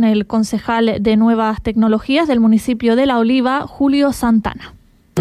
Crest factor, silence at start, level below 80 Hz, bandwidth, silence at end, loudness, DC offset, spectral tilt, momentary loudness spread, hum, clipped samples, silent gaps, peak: 10 dB; 0 s; -40 dBFS; 13.5 kHz; 0 s; -15 LUFS; under 0.1%; -6 dB/octave; 5 LU; none; under 0.1%; none; -4 dBFS